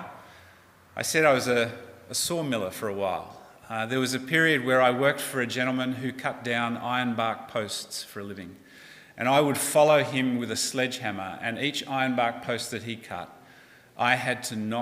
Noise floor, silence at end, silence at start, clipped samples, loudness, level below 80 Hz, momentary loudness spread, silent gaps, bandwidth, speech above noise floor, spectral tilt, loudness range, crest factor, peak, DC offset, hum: -55 dBFS; 0 s; 0 s; under 0.1%; -26 LUFS; -70 dBFS; 15 LU; none; 16 kHz; 28 dB; -3.5 dB/octave; 5 LU; 22 dB; -6 dBFS; under 0.1%; none